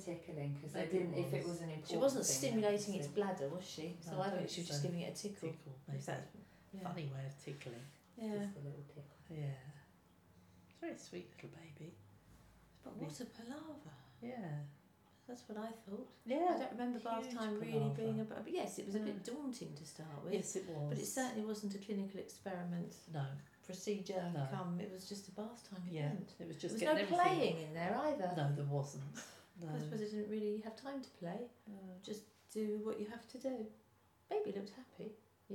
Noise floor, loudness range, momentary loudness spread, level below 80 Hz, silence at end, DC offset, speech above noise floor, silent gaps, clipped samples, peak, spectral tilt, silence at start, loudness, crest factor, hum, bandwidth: -71 dBFS; 13 LU; 16 LU; -80 dBFS; 0 s; under 0.1%; 29 dB; none; under 0.1%; -20 dBFS; -5 dB/octave; 0 s; -43 LUFS; 22 dB; none; 19 kHz